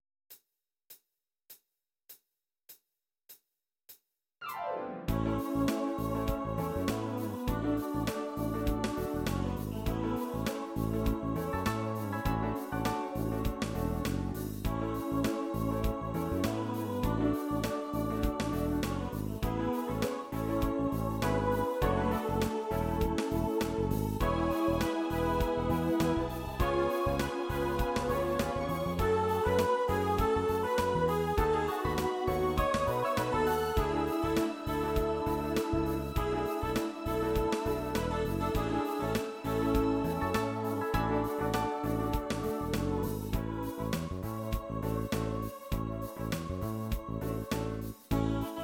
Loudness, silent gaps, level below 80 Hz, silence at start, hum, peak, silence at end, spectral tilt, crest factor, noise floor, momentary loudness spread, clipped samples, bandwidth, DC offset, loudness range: -33 LUFS; none; -42 dBFS; 0.3 s; none; -16 dBFS; 0 s; -6.5 dB/octave; 16 dB; -87 dBFS; 6 LU; under 0.1%; 17 kHz; under 0.1%; 5 LU